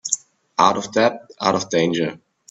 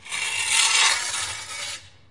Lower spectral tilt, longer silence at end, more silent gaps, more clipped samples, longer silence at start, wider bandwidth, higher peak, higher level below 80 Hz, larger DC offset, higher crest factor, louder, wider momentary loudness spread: first, -3.5 dB/octave vs 2.5 dB/octave; first, 0.35 s vs 0.2 s; neither; neither; about the same, 0.05 s vs 0.05 s; second, 8.4 kHz vs 11.5 kHz; first, 0 dBFS vs -4 dBFS; about the same, -62 dBFS vs -64 dBFS; second, under 0.1% vs 0.2%; about the same, 20 dB vs 20 dB; about the same, -20 LUFS vs -20 LUFS; second, 7 LU vs 15 LU